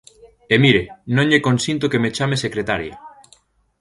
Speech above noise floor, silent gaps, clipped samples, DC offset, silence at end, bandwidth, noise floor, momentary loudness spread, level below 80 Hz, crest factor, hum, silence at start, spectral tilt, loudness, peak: 37 dB; none; under 0.1%; under 0.1%; 0.75 s; 11.5 kHz; -55 dBFS; 9 LU; -48 dBFS; 20 dB; none; 0.25 s; -5.5 dB/octave; -18 LUFS; 0 dBFS